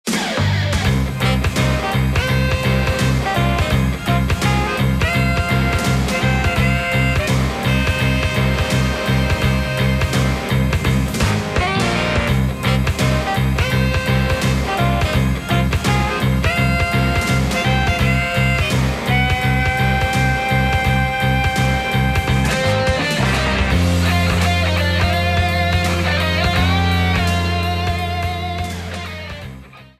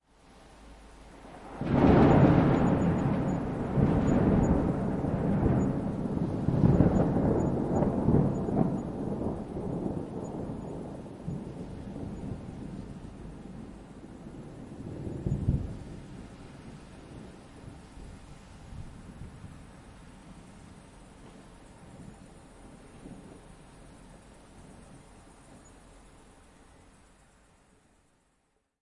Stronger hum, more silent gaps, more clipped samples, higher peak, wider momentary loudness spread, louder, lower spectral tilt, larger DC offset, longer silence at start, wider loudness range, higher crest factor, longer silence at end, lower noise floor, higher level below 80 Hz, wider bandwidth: neither; neither; neither; first, -2 dBFS vs -10 dBFS; second, 2 LU vs 25 LU; first, -17 LUFS vs -28 LUFS; second, -5.5 dB/octave vs -9 dB/octave; neither; second, 0.05 s vs 0.6 s; second, 1 LU vs 25 LU; second, 14 dB vs 20 dB; second, 0.15 s vs 3.25 s; second, -37 dBFS vs -74 dBFS; first, -24 dBFS vs -44 dBFS; first, 15.5 kHz vs 11 kHz